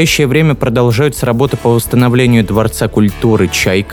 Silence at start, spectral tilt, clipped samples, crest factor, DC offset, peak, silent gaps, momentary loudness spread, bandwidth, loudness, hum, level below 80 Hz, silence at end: 0 s; -5.5 dB/octave; under 0.1%; 10 dB; under 0.1%; 0 dBFS; none; 3 LU; 19.5 kHz; -11 LUFS; none; -30 dBFS; 0 s